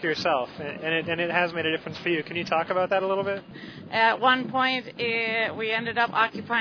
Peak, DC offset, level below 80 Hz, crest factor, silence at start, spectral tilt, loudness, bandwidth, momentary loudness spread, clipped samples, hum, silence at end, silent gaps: -6 dBFS; under 0.1%; -68 dBFS; 20 dB; 0 s; -5 dB/octave; -25 LUFS; 5.4 kHz; 8 LU; under 0.1%; none; 0 s; none